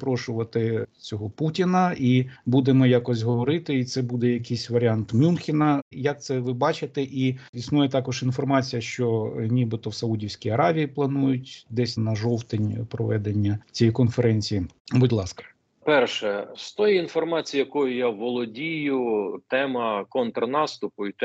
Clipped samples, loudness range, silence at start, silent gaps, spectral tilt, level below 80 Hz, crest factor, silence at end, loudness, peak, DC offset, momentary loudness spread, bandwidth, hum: under 0.1%; 3 LU; 0 s; 5.82-5.91 s, 7.49-7.53 s, 14.80-14.85 s; -7 dB/octave; -60 dBFS; 18 dB; 0 s; -24 LUFS; -6 dBFS; under 0.1%; 7 LU; 8 kHz; none